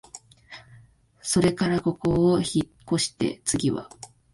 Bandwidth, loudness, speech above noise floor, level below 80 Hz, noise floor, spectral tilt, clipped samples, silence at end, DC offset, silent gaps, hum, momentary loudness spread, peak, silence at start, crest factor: 11.5 kHz; -24 LUFS; 30 dB; -50 dBFS; -54 dBFS; -5 dB/octave; under 0.1%; 0.25 s; under 0.1%; none; none; 23 LU; -8 dBFS; 0.15 s; 18 dB